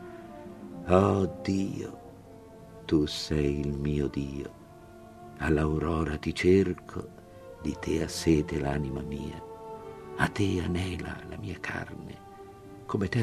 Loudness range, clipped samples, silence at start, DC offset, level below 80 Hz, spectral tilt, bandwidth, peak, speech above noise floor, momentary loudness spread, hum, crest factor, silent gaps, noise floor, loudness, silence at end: 5 LU; under 0.1%; 0 s; under 0.1%; -44 dBFS; -6.5 dB/octave; 14 kHz; -6 dBFS; 21 dB; 23 LU; none; 24 dB; none; -49 dBFS; -29 LUFS; 0 s